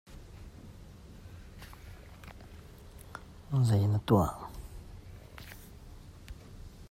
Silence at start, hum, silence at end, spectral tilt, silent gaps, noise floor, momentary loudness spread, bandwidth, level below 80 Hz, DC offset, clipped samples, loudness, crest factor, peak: 0.1 s; none; 0.05 s; -7.5 dB/octave; none; -50 dBFS; 25 LU; 16 kHz; -52 dBFS; under 0.1%; under 0.1%; -29 LUFS; 22 dB; -12 dBFS